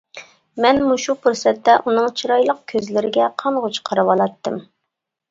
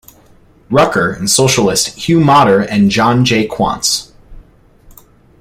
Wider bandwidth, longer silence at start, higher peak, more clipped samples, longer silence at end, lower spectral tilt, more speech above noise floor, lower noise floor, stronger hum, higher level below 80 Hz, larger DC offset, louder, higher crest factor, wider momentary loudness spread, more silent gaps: second, 7.8 kHz vs 16 kHz; second, 0.15 s vs 0.7 s; about the same, 0 dBFS vs 0 dBFS; neither; second, 0.7 s vs 1 s; about the same, -4 dB/octave vs -4 dB/octave; first, 62 dB vs 34 dB; first, -79 dBFS vs -45 dBFS; neither; second, -58 dBFS vs -40 dBFS; neither; second, -18 LUFS vs -11 LUFS; about the same, 18 dB vs 14 dB; about the same, 8 LU vs 6 LU; neither